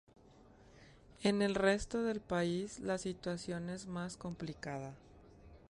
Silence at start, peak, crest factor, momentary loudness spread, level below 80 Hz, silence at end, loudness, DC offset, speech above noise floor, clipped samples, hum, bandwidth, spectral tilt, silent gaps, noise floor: 0.6 s; -16 dBFS; 22 dB; 12 LU; -60 dBFS; 0.15 s; -38 LUFS; under 0.1%; 25 dB; under 0.1%; none; 11.5 kHz; -5.5 dB/octave; none; -62 dBFS